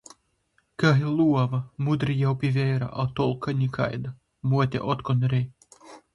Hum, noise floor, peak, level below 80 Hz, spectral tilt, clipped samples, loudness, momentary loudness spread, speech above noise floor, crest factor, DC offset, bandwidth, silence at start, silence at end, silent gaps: none; -69 dBFS; -6 dBFS; -56 dBFS; -8 dB/octave; under 0.1%; -25 LUFS; 7 LU; 46 dB; 18 dB; under 0.1%; 11 kHz; 0.8 s; 0.15 s; none